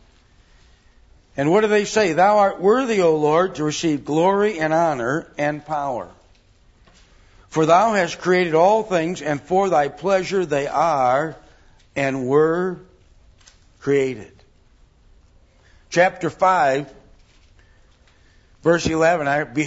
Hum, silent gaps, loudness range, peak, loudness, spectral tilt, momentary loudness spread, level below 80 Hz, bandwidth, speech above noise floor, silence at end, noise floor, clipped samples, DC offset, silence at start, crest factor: none; none; 6 LU; -2 dBFS; -19 LUFS; -5.5 dB/octave; 10 LU; -52 dBFS; 8 kHz; 36 dB; 0 s; -54 dBFS; under 0.1%; under 0.1%; 1.35 s; 18 dB